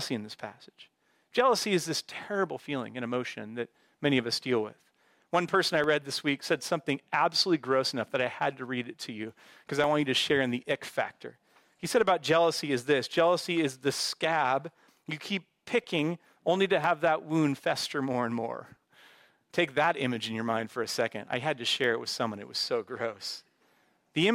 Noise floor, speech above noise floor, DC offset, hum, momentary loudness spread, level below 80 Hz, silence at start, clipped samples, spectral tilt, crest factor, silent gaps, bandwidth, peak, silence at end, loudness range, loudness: -68 dBFS; 39 dB; under 0.1%; none; 13 LU; -72 dBFS; 0 s; under 0.1%; -4 dB/octave; 18 dB; none; 16 kHz; -12 dBFS; 0 s; 4 LU; -29 LUFS